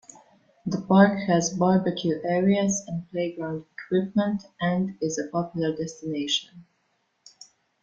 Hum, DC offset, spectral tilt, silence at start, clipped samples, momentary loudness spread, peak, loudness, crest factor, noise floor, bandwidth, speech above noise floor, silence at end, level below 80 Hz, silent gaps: none; under 0.1%; -5 dB/octave; 0.65 s; under 0.1%; 12 LU; -4 dBFS; -25 LUFS; 20 dB; -72 dBFS; 7.8 kHz; 47 dB; 1.2 s; -64 dBFS; none